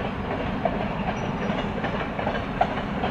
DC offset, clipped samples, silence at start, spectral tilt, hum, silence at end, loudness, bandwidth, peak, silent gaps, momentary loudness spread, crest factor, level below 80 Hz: under 0.1%; under 0.1%; 0 s; -7 dB/octave; none; 0 s; -27 LUFS; 8.6 kHz; -8 dBFS; none; 2 LU; 20 dB; -40 dBFS